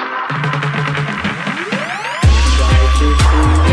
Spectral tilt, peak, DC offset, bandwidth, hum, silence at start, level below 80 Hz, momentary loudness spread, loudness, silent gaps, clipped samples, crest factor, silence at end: -5.5 dB/octave; -2 dBFS; under 0.1%; 11 kHz; none; 0 s; -16 dBFS; 7 LU; -14 LUFS; none; under 0.1%; 12 dB; 0 s